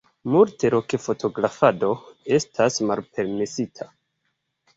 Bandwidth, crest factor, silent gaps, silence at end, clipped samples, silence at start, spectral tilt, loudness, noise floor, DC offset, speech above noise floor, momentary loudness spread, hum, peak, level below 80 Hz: 8 kHz; 20 dB; none; 0.9 s; under 0.1%; 0.25 s; -5.5 dB/octave; -22 LUFS; -75 dBFS; under 0.1%; 53 dB; 11 LU; none; -2 dBFS; -62 dBFS